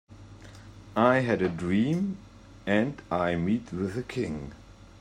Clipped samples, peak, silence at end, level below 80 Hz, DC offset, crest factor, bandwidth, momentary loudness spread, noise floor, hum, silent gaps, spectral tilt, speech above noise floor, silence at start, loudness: under 0.1%; -8 dBFS; 0.3 s; -54 dBFS; under 0.1%; 20 dB; 11 kHz; 24 LU; -47 dBFS; none; none; -7.5 dB/octave; 21 dB; 0.1 s; -28 LUFS